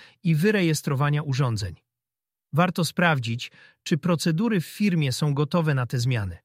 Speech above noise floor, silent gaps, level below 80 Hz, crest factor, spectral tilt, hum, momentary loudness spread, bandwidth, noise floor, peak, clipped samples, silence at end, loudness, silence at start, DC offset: over 66 dB; none; -56 dBFS; 20 dB; -6 dB/octave; none; 8 LU; 15.5 kHz; under -90 dBFS; -4 dBFS; under 0.1%; 0.1 s; -24 LUFS; 0 s; under 0.1%